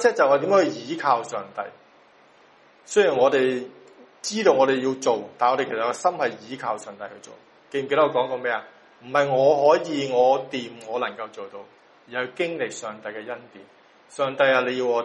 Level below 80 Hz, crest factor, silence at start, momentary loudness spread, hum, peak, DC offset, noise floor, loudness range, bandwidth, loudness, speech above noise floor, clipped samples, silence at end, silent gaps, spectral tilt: -72 dBFS; 20 dB; 0 s; 17 LU; none; -4 dBFS; under 0.1%; -55 dBFS; 6 LU; 11 kHz; -23 LUFS; 32 dB; under 0.1%; 0 s; none; -4 dB/octave